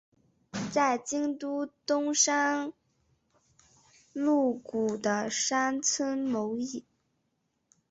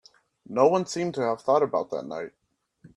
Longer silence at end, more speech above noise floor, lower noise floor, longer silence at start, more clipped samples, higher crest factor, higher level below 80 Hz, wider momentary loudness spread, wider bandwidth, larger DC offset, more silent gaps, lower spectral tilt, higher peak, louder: first, 1.1 s vs 0.1 s; first, 49 dB vs 32 dB; first, -78 dBFS vs -57 dBFS; about the same, 0.55 s vs 0.5 s; neither; about the same, 18 dB vs 20 dB; about the same, -72 dBFS vs -72 dBFS; about the same, 12 LU vs 14 LU; second, 8.2 kHz vs 11.5 kHz; neither; neither; second, -2.5 dB/octave vs -5.5 dB/octave; second, -12 dBFS vs -8 dBFS; second, -29 LUFS vs -25 LUFS